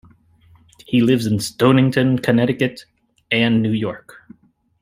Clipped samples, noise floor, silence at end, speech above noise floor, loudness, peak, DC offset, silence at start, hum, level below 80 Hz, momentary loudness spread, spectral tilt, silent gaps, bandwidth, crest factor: under 0.1%; -52 dBFS; 0.85 s; 35 dB; -17 LUFS; -2 dBFS; under 0.1%; 0.9 s; none; -56 dBFS; 8 LU; -6 dB/octave; none; 15.5 kHz; 18 dB